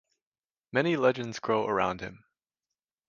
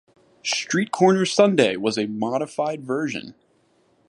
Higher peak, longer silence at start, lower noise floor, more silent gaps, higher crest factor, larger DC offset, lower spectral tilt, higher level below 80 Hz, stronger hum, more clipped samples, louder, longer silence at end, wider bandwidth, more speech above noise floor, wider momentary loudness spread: second, -10 dBFS vs -2 dBFS; first, 0.75 s vs 0.45 s; first, under -90 dBFS vs -62 dBFS; neither; about the same, 22 dB vs 20 dB; neither; first, -6 dB/octave vs -4.5 dB/octave; about the same, -64 dBFS vs -68 dBFS; neither; neither; second, -28 LUFS vs -21 LUFS; about the same, 0.9 s vs 0.8 s; second, 7.4 kHz vs 11.5 kHz; first, over 62 dB vs 41 dB; about the same, 11 LU vs 9 LU